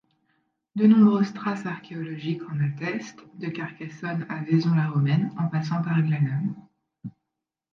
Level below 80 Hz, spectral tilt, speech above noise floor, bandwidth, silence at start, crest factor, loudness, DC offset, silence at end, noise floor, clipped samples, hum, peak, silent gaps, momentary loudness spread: -72 dBFS; -8.5 dB/octave; 61 dB; 7 kHz; 0.75 s; 18 dB; -25 LUFS; under 0.1%; 0.65 s; -85 dBFS; under 0.1%; none; -8 dBFS; none; 17 LU